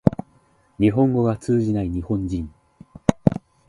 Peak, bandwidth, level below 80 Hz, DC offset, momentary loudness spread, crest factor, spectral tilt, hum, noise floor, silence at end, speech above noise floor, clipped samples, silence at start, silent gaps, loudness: 0 dBFS; 11.5 kHz; -40 dBFS; under 0.1%; 10 LU; 22 dB; -8.5 dB/octave; none; -58 dBFS; 0.3 s; 38 dB; under 0.1%; 0.05 s; none; -22 LUFS